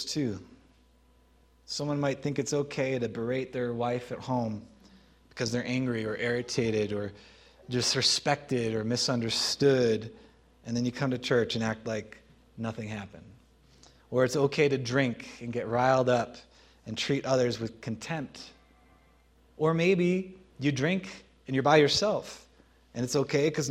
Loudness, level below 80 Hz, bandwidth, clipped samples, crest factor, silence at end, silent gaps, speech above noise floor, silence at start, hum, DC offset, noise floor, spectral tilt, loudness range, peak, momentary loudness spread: -29 LUFS; -62 dBFS; 15.5 kHz; under 0.1%; 24 dB; 0 s; none; 34 dB; 0 s; none; under 0.1%; -62 dBFS; -4.5 dB/octave; 5 LU; -6 dBFS; 15 LU